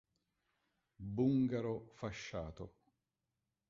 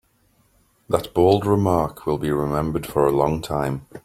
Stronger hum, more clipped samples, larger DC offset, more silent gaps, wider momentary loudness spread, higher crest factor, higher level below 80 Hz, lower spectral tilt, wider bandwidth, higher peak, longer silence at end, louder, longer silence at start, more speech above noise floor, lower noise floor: neither; neither; neither; neither; first, 19 LU vs 7 LU; about the same, 20 dB vs 20 dB; second, -64 dBFS vs -44 dBFS; about the same, -7.5 dB/octave vs -7 dB/octave; second, 7.4 kHz vs 16 kHz; second, -22 dBFS vs -2 dBFS; first, 1 s vs 0.05 s; second, -39 LUFS vs -21 LUFS; about the same, 1 s vs 0.9 s; first, 51 dB vs 41 dB; first, -89 dBFS vs -62 dBFS